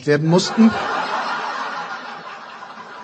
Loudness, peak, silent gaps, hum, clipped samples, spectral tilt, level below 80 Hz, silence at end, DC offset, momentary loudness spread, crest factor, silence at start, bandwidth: -19 LUFS; -2 dBFS; none; none; under 0.1%; -5.5 dB/octave; -64 dBFS; 0 s; under 0.1%; 19 LU; 18 dB; 0 s; 8.8 kHz